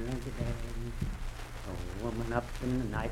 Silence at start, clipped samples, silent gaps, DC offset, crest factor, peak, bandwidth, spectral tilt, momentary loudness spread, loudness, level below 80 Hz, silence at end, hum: 0 s; under 0.1%; none; under 0.1%; 20 dB; -14 dBFS; 16 kHz; -6.5 dB/octave; 9 LU; -37 LUFS; -40 dBFS; 0 s; none